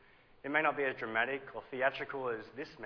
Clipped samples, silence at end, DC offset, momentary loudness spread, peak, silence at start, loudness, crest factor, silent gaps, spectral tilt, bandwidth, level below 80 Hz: under 0.1%; 0 s; under 0.1%; 12 LU; -16 dBFS; 0.45 s; -35 LUFS; 20 dB; none; -6 dB/octave; 5.4 kHz; -72 dBFS